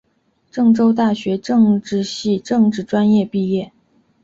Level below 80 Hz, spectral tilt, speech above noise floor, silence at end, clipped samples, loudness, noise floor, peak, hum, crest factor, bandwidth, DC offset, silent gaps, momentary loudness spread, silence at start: -56 dBFS; -7 dB/octave; 47 dB; 0.55 s; under 0.1%; -17 LUFS; -63 dBFS; -4 dBFS; none; 12 dB; 7.8 kHz; under 0.1%; none; 8 LU; 0.55 s